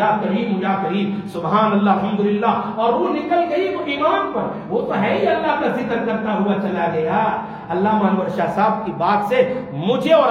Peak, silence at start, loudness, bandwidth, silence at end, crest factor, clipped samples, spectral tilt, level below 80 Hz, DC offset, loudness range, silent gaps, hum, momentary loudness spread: -2 dBFS; 0 s; -19 LUFS; 7 kHz; 0 s; 16 dB; under 0.1%; -7.5 dB/octave; -56 dBFS; under 0.1%; 1 LU; none; none; 5 LU